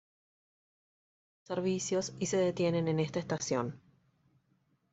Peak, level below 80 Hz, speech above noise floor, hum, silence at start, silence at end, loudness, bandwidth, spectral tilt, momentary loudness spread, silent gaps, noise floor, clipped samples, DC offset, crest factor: -18 dBFS; -72 dBFS; 42 dB; none; 1.5 s; 1.15 s; -33 LUFS; 8.2 kHz; -5 dB/octave; 5 LU; none; -74 dBFS; under 0.1%; under 0.1%; 18 dB